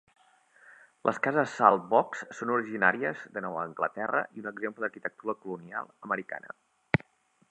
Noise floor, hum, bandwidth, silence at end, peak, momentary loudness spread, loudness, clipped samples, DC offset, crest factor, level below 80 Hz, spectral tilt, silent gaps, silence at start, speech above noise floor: -62 dBFS; none; 10 kHz; 0.55 s; -4 dBFS; 14 LU; -30 LUFS; under 0.1%; under 0.1%; 28 dB; -66 dBFS; -6.5 dB/octave; none; 0.7 s; 32 dB